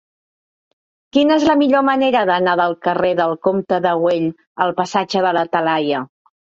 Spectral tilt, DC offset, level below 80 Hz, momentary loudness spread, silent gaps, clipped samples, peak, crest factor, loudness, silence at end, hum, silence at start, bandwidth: -5.5 dB/octave; under 0.1%; -58 dBFS; 7 LU; 4.47-4.55 s; under 0.1%; -2 dBFS; 16 dB; -17 LUFS; 0.45 s; none; 1.15 s; 7.8 kHz